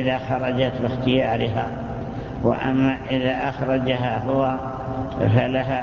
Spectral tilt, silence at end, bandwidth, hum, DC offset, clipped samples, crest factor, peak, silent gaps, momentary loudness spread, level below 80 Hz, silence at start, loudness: -8.5 dB/octave; 0 s; 7 kHz; none; under 0.1%; under 0.1%; 20 dB; -2 dBFS; none; 8 LU; -42 dBFS; 0 s; -23 LUFS